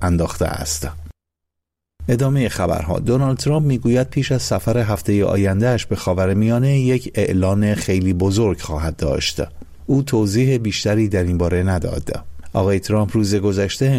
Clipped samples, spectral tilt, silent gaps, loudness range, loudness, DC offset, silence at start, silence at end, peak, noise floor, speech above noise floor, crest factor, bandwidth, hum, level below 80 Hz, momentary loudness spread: under 0.1%; -6 dB/octave; none; 2 LU; -18 LUFS; under 0.1%; 0 s; 0 s; -6 dBFS; -81 dBFS; 63 dB; 12 dB; 16 kHz; none; -36 dBFS; 7 LU